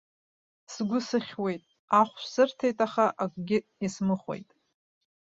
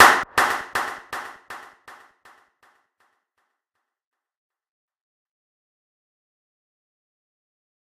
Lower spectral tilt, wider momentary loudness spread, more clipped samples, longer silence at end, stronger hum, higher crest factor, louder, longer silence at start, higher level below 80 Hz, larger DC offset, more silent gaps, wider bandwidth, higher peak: first, -5.5 dB/octave vs -1 dB/octave; second, 11 LU vs 22 LU; neither; second, 0.95 s vs 6.4 s; neither; about the same, 22 dB vs 26 dB; second, -28 LUFS vs -21 LUFS; first, 0.7 s vs 0 s; second, -70 dBFS vs -62 dBFS; neither; first, 1.79-1.88 s vs none; second, 7.8 kHz vs 15.5 kHz; second, -8 dBFS vs 0 dBFS